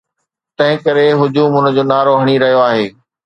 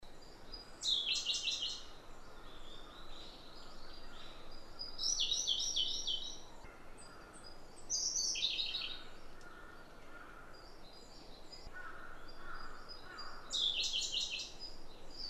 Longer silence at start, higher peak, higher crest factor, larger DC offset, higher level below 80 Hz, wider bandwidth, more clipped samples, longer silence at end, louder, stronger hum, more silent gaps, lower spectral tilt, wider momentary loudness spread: first, 0.6 s vs 0 s; first, 0 dBFS vs -22 dBFS; second, 12 dB vs 20 dB; neither; second, -60 dBFS vs -54 dBFS; second, 8.6 kHz vs 14 kHz; neither; first, 0.35 s vs 0 s; first, -12 LUFS vs -36 LUFS; neither; neither; first, -7.5 dB/octave vs 0.5 dB/octave; second, 4 LU vs 22 LU